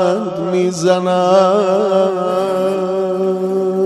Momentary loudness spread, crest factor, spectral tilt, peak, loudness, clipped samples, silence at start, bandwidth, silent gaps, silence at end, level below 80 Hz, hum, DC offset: 6 LU; 14 dB; -6 dB/octave; 0 dBFS; -15 LUFS; under 0.1%; 0 s; 12.5 kHz; none; 0 s; -62 dBFS; none; under 0.1%